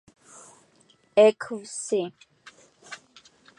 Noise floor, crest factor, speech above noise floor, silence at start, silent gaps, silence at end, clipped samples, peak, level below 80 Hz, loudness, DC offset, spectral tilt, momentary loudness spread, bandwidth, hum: -61 dBFS; 22 dB; 39 dB; 1.15 s; none; 0.65 s; under 0.1%; -6 dBFS; -80 dBFS; -24 LUFS; under 0.1%; -3.5 dB/octave; 24 LU; 11.5 kHz; none